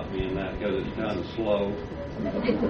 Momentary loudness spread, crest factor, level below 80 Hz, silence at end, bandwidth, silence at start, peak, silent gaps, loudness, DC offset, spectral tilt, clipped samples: 6 LU; 18 dB; -42 dBFS; 0 s; 6.8 kHz; 0 s; -10 dBFS; none; -29 LUFS; under 0.1%; -8 dB/octave; under 0.1%